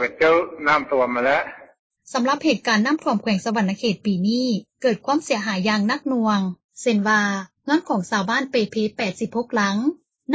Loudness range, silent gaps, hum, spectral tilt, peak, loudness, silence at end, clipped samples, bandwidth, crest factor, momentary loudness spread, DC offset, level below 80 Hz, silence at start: 1 LU; 1.79-1.90 s, 6.64-6.69 s; none; -5 dB/octave; -6 dBFS; -21 LUFS; 0 s; under 0.1%; 8 kHz; 16 dB; 6 LU; under 0.1%; -62 dBFS; 0 s